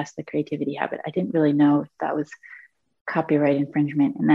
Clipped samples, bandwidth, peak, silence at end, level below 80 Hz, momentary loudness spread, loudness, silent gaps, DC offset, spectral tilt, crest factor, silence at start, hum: under 0.1%; 7.4 kHz; -6 dBFS; 0 s; -70 dBFS; 10 LU; -23 LUFS; 3.01-3.05 s; under 0.1%; -8 dB/octave; 16 dB; 0 s; none